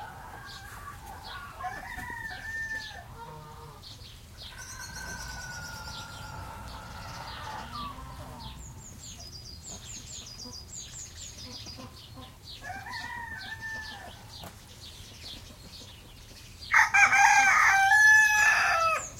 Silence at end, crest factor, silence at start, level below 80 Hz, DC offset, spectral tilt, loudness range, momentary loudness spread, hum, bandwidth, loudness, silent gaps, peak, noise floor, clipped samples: 0 s; 24 dB; 0 s; -52 dBFS; under 0.1%; -1 dB/octave; 20 LU; 26 LU; none; 16.5 kHz; -23 LUFS; none; -6 dBFS; -49 dBFS; under 0.1%